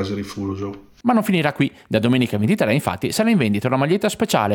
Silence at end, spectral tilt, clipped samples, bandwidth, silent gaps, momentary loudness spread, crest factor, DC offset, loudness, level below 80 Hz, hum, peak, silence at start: 0 s; -6 dB/octave; under 0.1%; 19 kHz; none; 9 LU; 16 dB; under 0.1%; -20 LUFS; -56 dBFS; none; -4 dBFS; 0 s